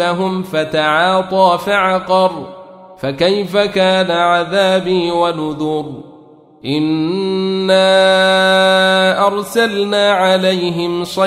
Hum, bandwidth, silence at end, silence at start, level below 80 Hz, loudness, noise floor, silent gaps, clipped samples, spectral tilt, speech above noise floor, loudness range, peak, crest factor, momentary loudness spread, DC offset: none; 15 kHz; 0 s; 0 s; -54 dBFS; -13 LUFS; -42 dBFS; none; under 0.1%; -4.5 dB/octave; 29 dB; 4 LU; 0 dBFS; 12 dB; 9 LU; under 0.1%